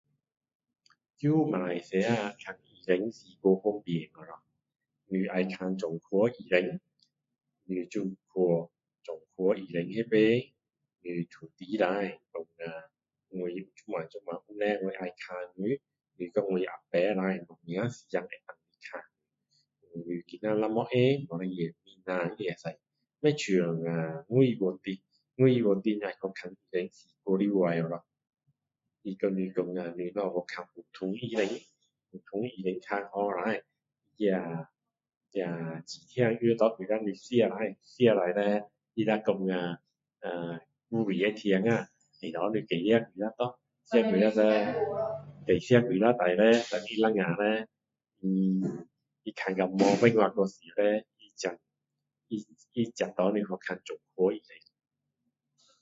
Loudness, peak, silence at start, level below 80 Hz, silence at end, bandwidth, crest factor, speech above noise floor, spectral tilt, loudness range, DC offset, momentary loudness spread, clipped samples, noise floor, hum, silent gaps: -30 LUFS; -6 dBFS; 1.2 s; -72 dBFS; 1.25 s; 7.8 kHz; 24 dB; 57 dB; -6.5 dB/octave; 8 LU; under 0.1%; 17 LU; under 0.1%; -87 dBFS; none; 35.17-35.21 s